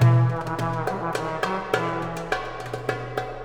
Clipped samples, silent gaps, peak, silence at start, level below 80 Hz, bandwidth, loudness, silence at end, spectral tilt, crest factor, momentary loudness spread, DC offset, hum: under 0.1%; none; -4 dBFS; 0 s; -46 dBFS; 12 kHz; -26 LUFS; 0 s; -6.5 dB/octave; 20 dB; 7 LU; under 0.1%; none